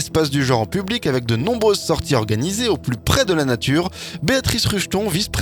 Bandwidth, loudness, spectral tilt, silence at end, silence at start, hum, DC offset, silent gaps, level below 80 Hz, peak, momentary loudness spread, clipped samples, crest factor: 19 kHz; -19 LUFS; -4.5 dB/octave; 0 s; 0 s; none; under 0.1%; none; -38 dBFS; 0 dBFS; 4 LU; under 0.1%; 18 dB